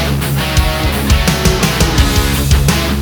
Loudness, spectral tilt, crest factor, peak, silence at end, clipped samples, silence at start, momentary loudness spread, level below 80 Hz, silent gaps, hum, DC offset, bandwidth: -13 LUFS; -4.5 dB/octave; 12 dB; 0 dBFS; 0 s; under 0.1%; 0 s; 3 LU; -16 dBFS; none; none; under 0.1%; over 20 kHz